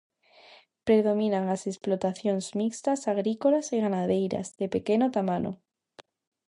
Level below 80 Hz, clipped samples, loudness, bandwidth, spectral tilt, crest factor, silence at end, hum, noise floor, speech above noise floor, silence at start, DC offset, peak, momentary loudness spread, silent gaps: -66 dBFS; under 0.1%; -27 LUFS; 11 kHz; -6 dB/octave; 18 dB; 0.95 s; none; -56 dBFS; 30 dB; 0.85 s; under 0.1%; -10 dBFS; 7 LU; none